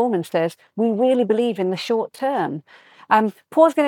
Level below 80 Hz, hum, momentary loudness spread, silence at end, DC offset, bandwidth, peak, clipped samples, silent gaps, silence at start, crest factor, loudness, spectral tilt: -72 dBFS; none; 7 LU; 0 s; under 0.1%; 17.5 kHz; -4 dBFS; under 0.1%; none; 0 s; 16 dB; -20 LUFS; -6 dB/octave